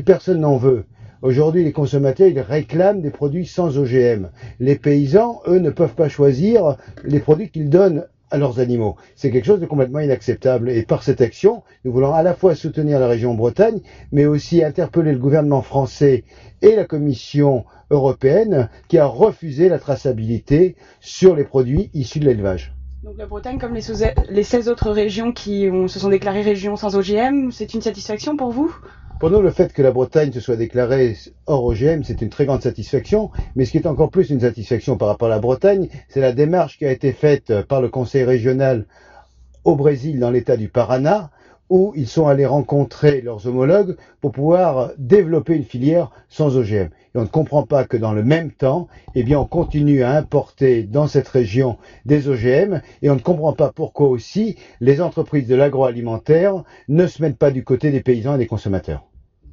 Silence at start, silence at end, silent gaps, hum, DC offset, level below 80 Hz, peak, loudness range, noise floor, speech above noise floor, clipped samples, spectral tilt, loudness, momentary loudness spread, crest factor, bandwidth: 0 s; 0.55 s; none; none; under 0.1%; -38 dBFS; 0 dBFS; 3 LU; -46 dBFS; 30 dB; under 0.1%; -8.5 dB/octave; -17 LUFS; 8 LU; 16 dB; 7.2 kHz